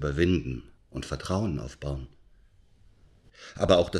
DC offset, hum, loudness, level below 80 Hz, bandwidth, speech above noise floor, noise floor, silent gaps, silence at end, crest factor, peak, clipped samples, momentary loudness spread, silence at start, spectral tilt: under 0.1%; none; -29 LUFS; -44 dBFS; 12.5 kHz; 31 dB; -58 dBFS; none; 0 s; 22 dB; -6 dBFS; under 0.1%; 20 LU; 0 s; -6 dB/octave